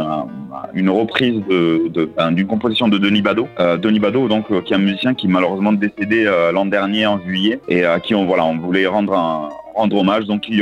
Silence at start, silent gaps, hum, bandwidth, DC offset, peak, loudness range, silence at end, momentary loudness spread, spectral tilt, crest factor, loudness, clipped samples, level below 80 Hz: 0 s; none; none; 8 kHz; under 0.1%; 0 dBFS; 1 LU; 0 s; 4 LU; -7.5 dB/octave; 16 dB; -16 LUFS; under 0.1%; -54 dBFS